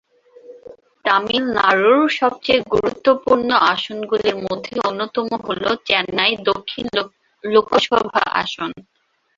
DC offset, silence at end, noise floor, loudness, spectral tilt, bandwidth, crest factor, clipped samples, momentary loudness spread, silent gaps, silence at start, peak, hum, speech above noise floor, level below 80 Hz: under 0.1%; 0.55 s; -44 dBFS; -18 LUFS; -4.5 dB/octave; 7.6 kHz; 18 dB; under 0.1%; 9 LU; none; 0.5 s; -2 dBFS; none; 26 dB; -54 dBFS